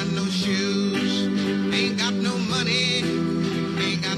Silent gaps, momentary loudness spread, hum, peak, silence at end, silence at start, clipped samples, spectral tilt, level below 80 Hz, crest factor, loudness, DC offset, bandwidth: none; 4 LU; none; -10 dBFS; 0 s; 0 s; under 0.1%; -4.5 dB/octave; -58 dBFS; 14 dB; -23 LUFS; under 0.1%; 13 kHz